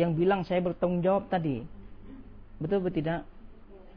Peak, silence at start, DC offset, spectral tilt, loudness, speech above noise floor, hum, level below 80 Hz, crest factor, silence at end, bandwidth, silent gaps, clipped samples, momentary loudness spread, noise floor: -12 dBFS; 0 s; under 0.1%; -10 dB/octave; -29 LUFS; 20 dB; none; -50 dBFS; 18 dB; 0.05 s; 5.4 kHz; none; under 0.1%; 23 LU; -48 dBFS